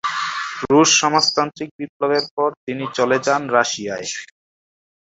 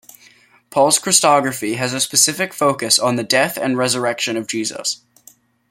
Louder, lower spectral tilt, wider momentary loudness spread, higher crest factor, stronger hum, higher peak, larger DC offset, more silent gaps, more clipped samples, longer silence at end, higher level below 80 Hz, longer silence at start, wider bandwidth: about the same, -18 LUFS vs -16 LUFS; about the same, -2.5 dB/octave vs -2 dB/octave; first, 14 LU vs 10 LU; about the same, 20 dB vs 18 dB; neither; about the same, 0 dBFS vs 0 dBFS; neither; first, 1.71-1.79 s, 1.89-2.00 s, 2.31-2.37 s, 2.57-2.67 s vs none; neither; about the same, 0.8 s vs 0.75 s; about the same, -60 dBFS vs -64 dBFS; second, 0.05 s vs 0.7 s; second, 8 kHz vs 16.5 kHz